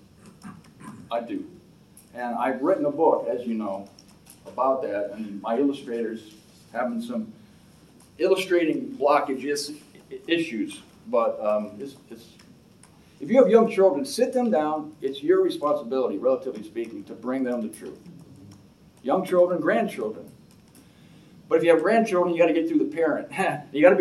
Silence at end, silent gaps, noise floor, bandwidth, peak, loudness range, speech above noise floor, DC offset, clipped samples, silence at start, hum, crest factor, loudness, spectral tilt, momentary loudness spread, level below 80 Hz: 0 s; none; -53 dBFS; 13 kHz; -2 dBFS; 7 LU; 29 dB; under 0.1%; under 0.1%; 0.25 s; none; 22 dB; -24 LUFS; -5.5 dB/octave; 20 LU; -68 dBFS